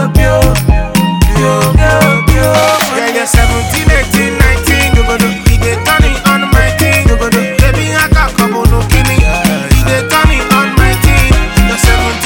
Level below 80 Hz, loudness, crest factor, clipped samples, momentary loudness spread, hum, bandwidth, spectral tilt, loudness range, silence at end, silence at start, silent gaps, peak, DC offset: -12 dBFS; -9 LUFS; 8 dB; 2%; 3 LU; none; over 20 kHz; -5 dB/octave; 1 LU; 0 s; 0 s; none; 0 dBFS; under 0.1%